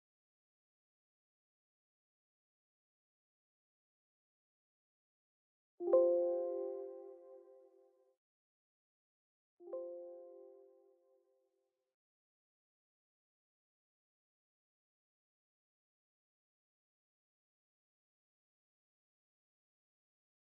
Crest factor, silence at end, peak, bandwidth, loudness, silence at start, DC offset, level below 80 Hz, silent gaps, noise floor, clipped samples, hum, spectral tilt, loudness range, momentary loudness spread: 28 dB; 9.9 s; -20 dBFS; 2.1 kHz; -37 LUFS; 5.8 s; under 0.1%; under -90 dBFS; 8.17-9.57 s; -85 dBFS; under 0.1%; none; -3 dB/octave; 16 LU; 26 LU